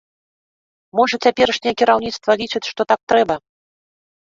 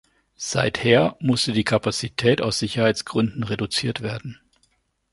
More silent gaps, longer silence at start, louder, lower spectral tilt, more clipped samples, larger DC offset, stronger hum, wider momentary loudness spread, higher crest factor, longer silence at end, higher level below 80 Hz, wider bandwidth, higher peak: first, 3.03-3.07 s vs none; first, 0.95 s vs 0.4 s; first, -18 LUFS vs -22 LUFS; about the same, -3.5 dB/octave vs -4.5 dB/octave; neither; neither; neither; second, 7 LU vs 11 LU; about the same, 18 dB vs 20 dB; about the same, 0.85 s vs 0.8 s; about the same, -56 dBFS vs -52 dBFS; second, 7.6 kHz vs 11.5 kHz; about the same, -2 dBFS vs -2 dBFS